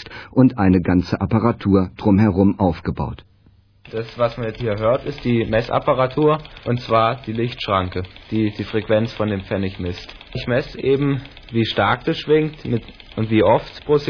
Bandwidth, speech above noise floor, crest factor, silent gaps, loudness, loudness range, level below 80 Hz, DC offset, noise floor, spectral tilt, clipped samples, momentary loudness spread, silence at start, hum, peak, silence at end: 5.4 kHz; 34 dB; 18 dB; none; -20 LUFS; 4 LU; -42 dBFS; under 0.1%; -53 dBFS; -8.5 dB/octave; under 0.1%; 11 LU; 0 s; none; -2 dBFS; 0 s